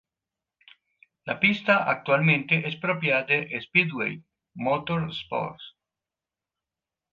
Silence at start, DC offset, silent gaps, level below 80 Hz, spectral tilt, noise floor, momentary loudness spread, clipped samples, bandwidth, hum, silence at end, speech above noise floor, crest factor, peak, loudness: 1.25 s; under 0.1%; none; -66 dBFS; -7.5 dB/octave; -90 dBFS; 12 LU; under 0.1%; 7 kHz; none; 1.45 s; 65 dB; 22 dB; -6 dBFS; -24 LUFS